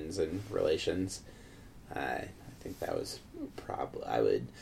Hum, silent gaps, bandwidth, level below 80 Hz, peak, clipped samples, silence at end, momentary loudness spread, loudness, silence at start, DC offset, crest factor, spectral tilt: none; none; 16 kHz; -56 dBFS; -18 dBFS; under 0.1%; 0 s; 17 LU; -36 LUFS; 0 s; under 0.1%; 18 dB; -5 dB/octave